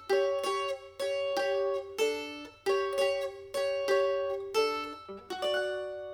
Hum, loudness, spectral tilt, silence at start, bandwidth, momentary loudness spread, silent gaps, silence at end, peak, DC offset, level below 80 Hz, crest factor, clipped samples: none; -32 LUFS; -2.5 dB/octave; 0 s; 17.5 kHz; 8 LU; none; 0 s; -16 dBFS; under 0.1%; -70 dBFS; 16 dB; under 0.1%